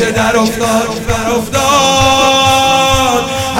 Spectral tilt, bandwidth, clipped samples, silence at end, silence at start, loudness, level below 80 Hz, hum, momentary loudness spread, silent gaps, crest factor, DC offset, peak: -3 dB/octave; 17.5 kHz; under 0.1%; 0 s; 0 s; -10 LUFS; -30 dBFS; none; 6 LU; none; 10 dB; under 0.1%; 0 dBFS